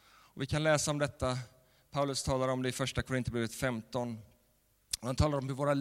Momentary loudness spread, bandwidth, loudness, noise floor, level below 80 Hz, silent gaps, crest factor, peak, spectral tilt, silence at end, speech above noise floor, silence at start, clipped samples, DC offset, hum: 11 LU; 16.5 kHz; -34 LUFS; -71 dBFS; -52 dBFS; none; 20 dB; -14 dBFS; -5 dB/octave; 0 s; 38 dB; 0.35 s; under 0.1%; under 0.1%; none